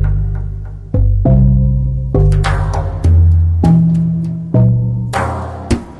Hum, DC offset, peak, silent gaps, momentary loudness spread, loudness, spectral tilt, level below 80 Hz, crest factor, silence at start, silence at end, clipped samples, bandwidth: none; under 0.1%; -2 dBFS; none; 10 LU; -14 LUFS; -8.5 dB/octave; -18 dBFS; 10 dB; 0 s; 0 s; under 0.1%; 11 kHz